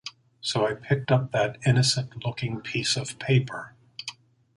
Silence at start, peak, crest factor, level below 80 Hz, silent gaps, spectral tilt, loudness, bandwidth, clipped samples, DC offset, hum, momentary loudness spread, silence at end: 0.05 s; -8 dBFS; 18 dB; -60 dBFS; none; -4.5 dB/octave; -26 LUFS; 11.5 kHz; under 0.1%; under 0.1%; none; 16 LU; 0.45 s